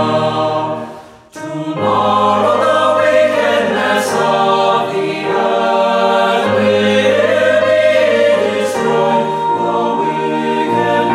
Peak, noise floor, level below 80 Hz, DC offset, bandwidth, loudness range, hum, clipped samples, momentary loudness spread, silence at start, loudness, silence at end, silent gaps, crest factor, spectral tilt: 0 dBFS; -34 dBFS; -58 dBFS; under 0.1%; 14.5 kHz; 2 LU; none; under 0.1%; 6 LU; 0 s; -13 LUFS; 0 s; none; 12 dB; -5 dB/octave